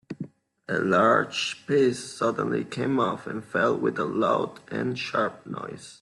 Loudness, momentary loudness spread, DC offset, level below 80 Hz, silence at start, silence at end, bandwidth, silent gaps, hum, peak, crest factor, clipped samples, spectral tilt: -25 LUFS; 15 LU; under 0.1%; -68 dBFS; 0.1 s; 0.05 s; 12 kHz; none; none; -8 dBFS; 20 dB; under 0.1%; -5 dB/octave